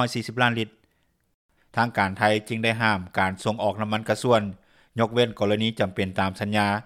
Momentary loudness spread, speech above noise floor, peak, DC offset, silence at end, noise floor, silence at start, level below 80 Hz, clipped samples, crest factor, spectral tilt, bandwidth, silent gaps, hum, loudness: 6 LU; 45 dB; -4 dBFS; under 0.1%; 0 s; -69 dBFS; 0 s; -62 dBFS; under 0.1%; 20 dB; -5.5 dB/octave; 15.5 kHz; 1.34-1.49 s; none; -24 LUFS